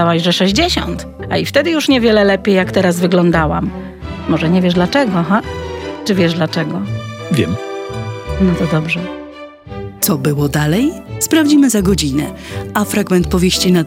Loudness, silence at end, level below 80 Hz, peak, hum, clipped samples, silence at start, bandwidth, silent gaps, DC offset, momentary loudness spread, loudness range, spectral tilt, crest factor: -14 LUFS; 0 s; -34 dBFS; 0 dBFS; none; under 0.1%; 0 s; 17 kHz; none; under 0.1%; 13 LU; 5 LU; -5 dB/octave; 14 dB